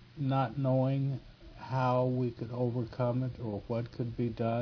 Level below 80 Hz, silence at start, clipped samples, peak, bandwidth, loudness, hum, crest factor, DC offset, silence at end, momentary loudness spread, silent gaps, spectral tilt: -58 dBFS; 0 s; under 0.1%; -18 dBFS; 5.4 kHz; -33 LUFS; none; 14 dB; under 0.1%; 0 s; 8 LU; none; -10 dB/octave